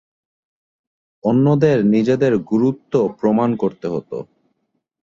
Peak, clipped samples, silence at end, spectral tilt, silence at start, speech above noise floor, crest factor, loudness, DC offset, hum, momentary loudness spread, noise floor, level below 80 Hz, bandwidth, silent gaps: -2 dBFS; under 0.1%; 0.8 s; -9 dB/octave; 1.25 s; 54 dB; 16 dB; -17 LUFS; under 0.1%; none; 11 LU; -71 dBFS; -58 dBFS; 7.4 kHz; none